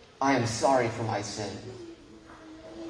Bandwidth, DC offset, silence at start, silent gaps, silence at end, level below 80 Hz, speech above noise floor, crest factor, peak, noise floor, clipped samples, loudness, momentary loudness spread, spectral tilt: 10.5 kHz; under 0.1%; 0 s; none; 0 s; -60 dBFS; 22 dB; 18 dB; -12 dBFS; -50 dBFS; under 0.1%; -28 LUFS; 24 LU; -5 dB/octave